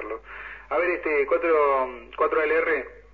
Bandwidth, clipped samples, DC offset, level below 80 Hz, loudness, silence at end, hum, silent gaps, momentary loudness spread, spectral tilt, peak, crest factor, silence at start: 4.8 kHz; under 0.1%; 0.1%; -52 dBFS; -23 LUFS; 0.15 s; none; none; 15 LU; -6.5 dB/octave; -10 dBFS; 14 dB; 0 s